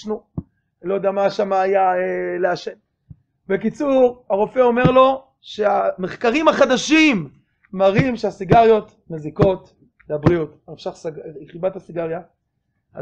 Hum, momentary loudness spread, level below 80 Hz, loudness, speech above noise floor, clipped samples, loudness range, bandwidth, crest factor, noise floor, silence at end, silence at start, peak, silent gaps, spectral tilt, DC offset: none; 18 LU; -46 dBFS; -18 LUFS; 54 dB; under 0.1%; 7 LU; 8.6 kHz; 18 dB; -72 dBFS; 0 s; 0 s; 0 dBFS; none; -6 dB/octave; under 0.1%